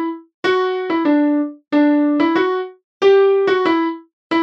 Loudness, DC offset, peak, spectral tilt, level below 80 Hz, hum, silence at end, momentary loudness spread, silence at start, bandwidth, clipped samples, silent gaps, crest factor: -16 LUFS; under 0.1%; -4 dBFS; -5.5 dB/octave; -70 dBFS; none; 0 s; 11 LU; 0 s; 6.8 kHz; under 0.1%; 0.34-0.43 s, 2.84-3.00 s, 4.13-4.30 s; 14 dB